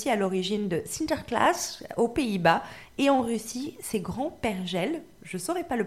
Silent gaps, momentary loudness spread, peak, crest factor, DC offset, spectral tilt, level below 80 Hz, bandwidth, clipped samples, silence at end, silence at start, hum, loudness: none; 10 LU; -8 dBFS; 20 dB; 0.1%; -4.5 dB/octave; -56 dBFS; 16 kHz; under 0.1%; 0 s; 0 s; none; -28 LUFS